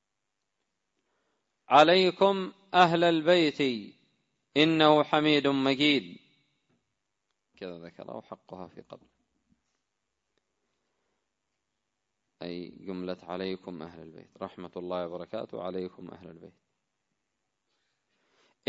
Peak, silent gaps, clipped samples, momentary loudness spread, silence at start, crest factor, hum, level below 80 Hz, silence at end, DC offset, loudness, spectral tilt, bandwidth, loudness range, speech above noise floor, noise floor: -6 dBFS; none; under 0.1%; 23 LU; 1.7 s; 24 dB; none; -74 dBFS; 2.2 s; under 0.1%; -25 LUFS; -5.5 dB/octave; 7.8 kHz; 23 LU; 57 dB; -84 dBFS